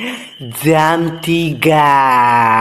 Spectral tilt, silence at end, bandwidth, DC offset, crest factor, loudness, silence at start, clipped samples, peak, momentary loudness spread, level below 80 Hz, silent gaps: -5.5 dB/octave; 0 s; 14 kHz; under 0.1%; 12 dB; -12 LUFS; 0 s; 0.2%; 0 dBFS; 13 LU; -48 dBFS; none